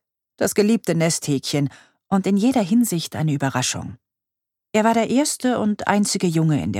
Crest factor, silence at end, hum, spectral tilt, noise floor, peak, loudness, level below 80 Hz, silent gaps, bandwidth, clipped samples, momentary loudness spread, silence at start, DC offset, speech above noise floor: 18 dB; 0 s; none; -5 dB/octave; -85 dBFS; -2 dBFS; -20 LUFS; -58 dBFS; none; 16.5 kHz; under 0.1%; 6 LU; 0.4 s; under 0.1%; 65 dB